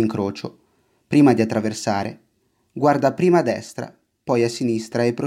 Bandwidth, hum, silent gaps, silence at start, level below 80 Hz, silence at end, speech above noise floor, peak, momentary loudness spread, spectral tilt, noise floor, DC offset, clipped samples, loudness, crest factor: 14.5 kHz; none; none; 0 s; -62 dBFS; 0 s; 47 dB; -4 dBFS; 18 LU; -6.5 dB/octave; -66 dBFS; under 0.1%; under 0.1%; -20 LUFS; 18 dB